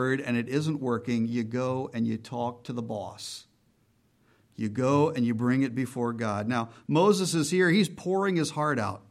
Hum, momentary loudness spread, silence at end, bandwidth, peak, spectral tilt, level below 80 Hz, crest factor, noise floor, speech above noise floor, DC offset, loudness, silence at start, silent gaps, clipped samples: none; 12 LU; 0.1 s; 15 kHz; -12 dBFS; -5.5 dB/octave; -70 dBFS; 16 dB; -67 dBFS; 40 dB; under 0.1%; -28 LUFS; 0 s; none; under 0.1%